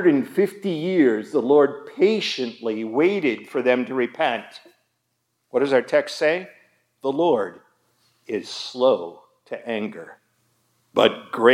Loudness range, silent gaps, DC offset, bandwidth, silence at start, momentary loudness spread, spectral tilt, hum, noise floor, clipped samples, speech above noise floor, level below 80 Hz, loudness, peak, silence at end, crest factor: 5 LU; none; under 0.1%; 14.5 kHz; 0 s; 12 LU; -5.5 dB/octave; none; -74 dBFS; under 0.1%; 53 dB; -84 dBFS; -22 LUFS; -2 dBFS; 0 s; 20 dB